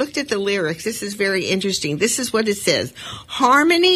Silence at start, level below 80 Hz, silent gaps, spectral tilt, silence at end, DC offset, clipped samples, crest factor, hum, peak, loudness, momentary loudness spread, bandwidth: 0 s; -56 dBFS; none; -3 dB/octave; 0 s; under 0.1%; under 0.1%; 18 dB; none; -2 dBFS; -19 LUFS; 11 LU; 15.5 kHz